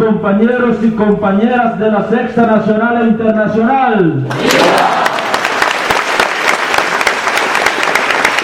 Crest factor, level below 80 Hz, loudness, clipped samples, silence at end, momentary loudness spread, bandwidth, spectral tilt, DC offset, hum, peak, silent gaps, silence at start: 12 dB; -46 dBFS; -11 LUFS; under 0.1%; 0 s; 3 LU; 17 kHz; -4.5 dB/octave; under 0.1%; none; 0 dBFS; none; 0 s